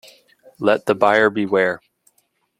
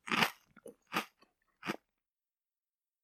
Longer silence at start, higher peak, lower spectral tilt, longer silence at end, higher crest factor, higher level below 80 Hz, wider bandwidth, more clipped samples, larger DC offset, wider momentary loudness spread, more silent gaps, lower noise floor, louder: first, 0.6 s vs 0.05 s; first, -2 dBFS vs -12 dBFS; first, -6 dB/octave vs -3 dB/octave; second, 0.85 s vs 1.25 s; second, 18 dB vs 30 dB; first, -64 dBFS vs -84 dBFS; second, 14.5 kHz vs 16 kHz; neither; neither; second, 8 LU vs 24 LU; neither; second, -66 dBFS vs under -90 dBFS; first, -18 LUFS vs -37 LUFS